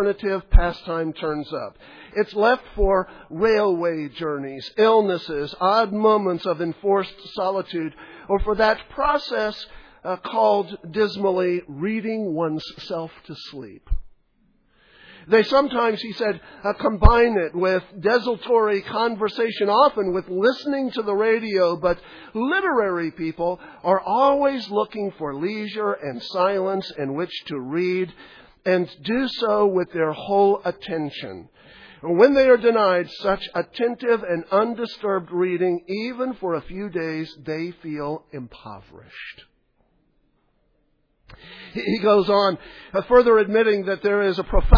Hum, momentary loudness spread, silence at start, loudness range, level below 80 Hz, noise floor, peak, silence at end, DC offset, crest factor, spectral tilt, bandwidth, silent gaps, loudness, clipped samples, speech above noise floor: none; 13 LU; 0 s; 8 LU; -32 dBFS; -66 dBFS; 0 dBFS; 0 s; under 0.1%; 22 dB; -7.5 dB/octave; 5.4 kHz; none; -22 LUFS; under 0.1%; 45 dB